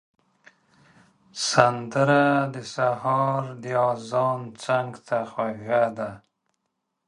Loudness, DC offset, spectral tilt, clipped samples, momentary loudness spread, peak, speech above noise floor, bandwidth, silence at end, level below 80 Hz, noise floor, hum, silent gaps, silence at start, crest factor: -24 LUFS; under 0.1%; -5 dB/octave; under 0.1%; 10 LU; 0 dBFS; 55 dB; 11.5 kHz; 0.9 s; -68 dBFS; -79 dBFS; none; none; 1.35 s; 24 dB